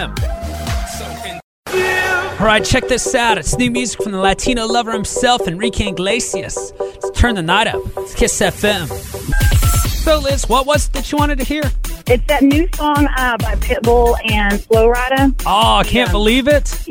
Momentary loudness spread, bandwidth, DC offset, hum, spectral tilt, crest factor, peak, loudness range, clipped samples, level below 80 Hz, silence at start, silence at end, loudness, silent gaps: 10 LU; 17 kHz; under 0.1%; none; -4 dB/octave; 14 dB; 0 dBFS; 3 LU; under 0.1%; -22 dBFS; 0 s; 0 s; -15 LUFS; 1.44-1.63 s